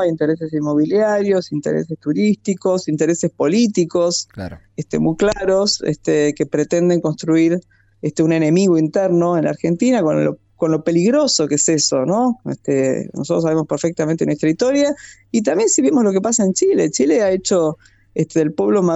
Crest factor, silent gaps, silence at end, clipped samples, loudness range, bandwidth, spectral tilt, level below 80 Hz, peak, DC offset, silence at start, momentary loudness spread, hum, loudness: 14 dB; none; 0 s; under 0.1%; 2 LU; 8.4 kHz; -5 dB/octave; -52 dBFS; -4 dBFS; under 0.1%; 0 s; 7 LU; none; -17 LUFS